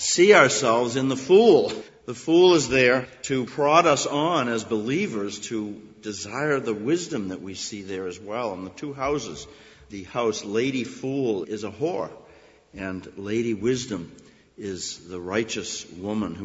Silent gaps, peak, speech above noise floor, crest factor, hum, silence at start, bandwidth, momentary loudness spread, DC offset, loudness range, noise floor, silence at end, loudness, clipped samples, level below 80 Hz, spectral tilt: none; -2 dBFS; 29 dB; 22 dB; none; 0 s; 8 kHz; 18 LU; under 0.1%; 11 LU; -52 dBFS; 0 s; -23 LUFS; under 0.1%; -58 dBFS; -4 dB/octave